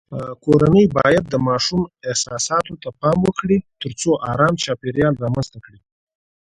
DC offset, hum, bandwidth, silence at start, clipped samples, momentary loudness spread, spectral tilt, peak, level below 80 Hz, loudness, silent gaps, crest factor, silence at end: under 0.1%; none; 11 kHz; 0.1 s; under 0.1%; 11 LU; -5 dB/octave; 0 dBFS; -46 dBFS; -18 LUFS; none; 18 dB; 0.9 s